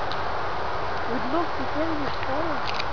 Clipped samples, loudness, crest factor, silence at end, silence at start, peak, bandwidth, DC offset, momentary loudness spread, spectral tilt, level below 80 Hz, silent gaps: under 0.1%; -28 LUFS; 16 dB; 0 s; 0 s; -12 dBFS; 5.4 kHz; 4%; 2 LU; -5.5 dB/octave; -44 dBFS; none